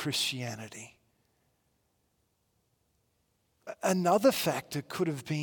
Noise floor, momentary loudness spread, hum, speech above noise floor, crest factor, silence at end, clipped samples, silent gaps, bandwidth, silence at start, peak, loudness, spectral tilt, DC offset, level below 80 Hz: -76 dBFS; 22 LU; none; 45 dB; 20 dB; 0 s; under 0.1%; none; 18 kHz; 0 s; -12 dBFS; -30 LUFS; -4.5 dB/octave; under 0.1%; -76 dBFS